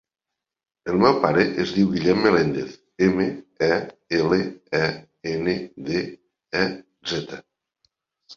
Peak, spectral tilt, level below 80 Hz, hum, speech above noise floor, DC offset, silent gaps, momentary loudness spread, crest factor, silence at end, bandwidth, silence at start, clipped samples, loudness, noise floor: -2 dBFS; -6 dB/octave; -54 dBFS; none; 64 dB; under 0.1%; none; 13 LU; 20 dB; 0 s; 7.4 kHz; 0.85 s; under 0.1%; -22 LUFS; -86 dBFS